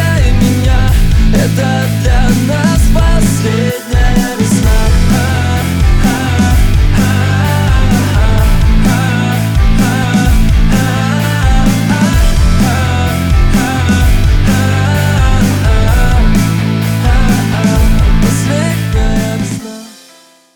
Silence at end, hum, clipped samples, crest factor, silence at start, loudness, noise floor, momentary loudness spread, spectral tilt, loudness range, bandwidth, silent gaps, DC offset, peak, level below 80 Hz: 0.65 s; none; under 0.1%; 8 dB; 0 s; -11 LUFS; -42 dBFS; 2 LU; -5.5 dB/octave; 1 LU; 19 kHz; none; under 0.1%; 0 dBFS; -12 dBFS